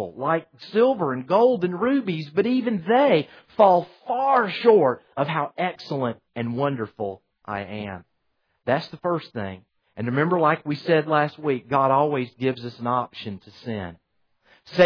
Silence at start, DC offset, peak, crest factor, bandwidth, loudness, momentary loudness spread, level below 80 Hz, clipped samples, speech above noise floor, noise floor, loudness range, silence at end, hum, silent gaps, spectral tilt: 0 s; under 0.1%; -4 dBFS; 18 dB; 5.4 kHz; -23 LUFS; 15 LU; -68 dBFS; under 0.1%; 49 dB; -72 dBFS; 9 LU; 0 s; none; none; -8 dB/octave